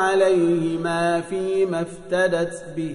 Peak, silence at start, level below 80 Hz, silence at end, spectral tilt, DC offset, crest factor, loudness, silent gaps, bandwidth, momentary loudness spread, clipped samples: -6 dBFS; 0 s; -56 dBFS; 0 s; -5.5 dB/octave; under 0.1%; 14 dB; -22 LUFS; none; 11 kHz; 9 LU; under 0.1%